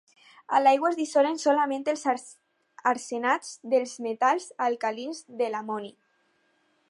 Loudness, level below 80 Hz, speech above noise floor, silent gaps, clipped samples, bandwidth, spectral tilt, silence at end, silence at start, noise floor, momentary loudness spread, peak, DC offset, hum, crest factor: -27 LUFS; -86 dBFS; 43 dB; none; under 0.1%; 11.5 kHz; -3 dB/octave; 1 s; 0.5 s; -69 dBFS; 11 LU; -10 dBFS; under 0.1%; none; 18 dB